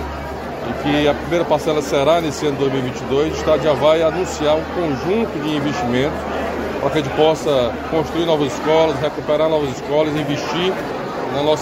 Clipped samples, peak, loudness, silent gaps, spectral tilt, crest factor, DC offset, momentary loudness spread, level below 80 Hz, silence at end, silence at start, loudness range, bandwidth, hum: under 0.1%; 0 dBFS; -18 LUFS; none; -5.5 dB/octave; 16 dB; under 0.1%; 7 LU; -38 dBFS; 0 s; 0 s; 2 LU; 16 kHz; none